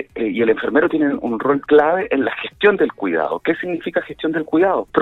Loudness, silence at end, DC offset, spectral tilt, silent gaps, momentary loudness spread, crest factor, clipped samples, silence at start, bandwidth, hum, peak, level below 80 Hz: -18 LUFS; 0 s; under 0.1%; -7.5 dB/octave; none; 8 LU; 16 dB; under 0.1%; 0 s; 4.1 kHz; none; -2 dBFS; -54 dBFS